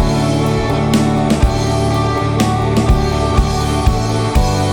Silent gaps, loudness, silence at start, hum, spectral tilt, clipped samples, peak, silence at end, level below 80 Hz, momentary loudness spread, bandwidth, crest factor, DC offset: none; -15 LUFS; 0 s; none; -6 dB/octave; under 0.1%; 0 dBFS; 0 s; -20 dBFS; 2 LU; 19 kHz; 14 dB; under 0.1%